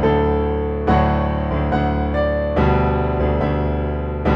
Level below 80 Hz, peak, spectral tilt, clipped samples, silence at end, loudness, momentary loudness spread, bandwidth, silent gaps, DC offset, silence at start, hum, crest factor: -24 dBFS; -4 dBFS; -9.5 dB/octave; under 0.1%; 0 s; -19 LUFS; 4 LU; 5.6 kHz; none; under 0.1%; 0 s; none; 14 dB